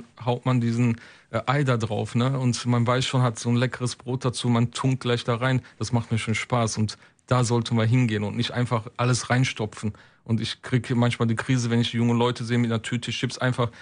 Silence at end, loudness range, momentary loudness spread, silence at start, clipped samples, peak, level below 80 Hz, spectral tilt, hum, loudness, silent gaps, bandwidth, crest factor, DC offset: 0 s; 1 LU; 6 LU; 0 s; under 0.1%; -8 dBFS; -58 dBFS; -5.5 dB/octave; none; -25 LUFS; none; 10.5 kHz; 16 dB; under 0.1%